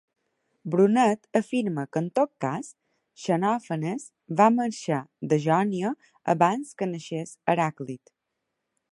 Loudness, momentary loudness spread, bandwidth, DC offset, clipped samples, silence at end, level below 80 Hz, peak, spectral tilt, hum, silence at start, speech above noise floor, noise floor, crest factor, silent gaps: -26 LUFS; 14 LU; 11.5 kHz; under 0.1%; under 0.1%; 0.95 s; -74 dBFS; -6 dBFS; -6.5 dB/octave; none; 0.65 s; 56 dB; -81 dBFS; 20 dB; none